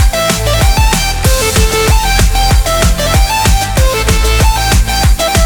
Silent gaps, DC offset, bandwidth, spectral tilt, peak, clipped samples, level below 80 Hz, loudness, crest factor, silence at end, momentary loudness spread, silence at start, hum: none; under 0.1%; over 20 kHz; -3.5 dB/octave; 0 dBFS; under 0.1%; -12 dBFS; -10 LUFS; 8 dB; 0 s; 1 LU; 0 s; none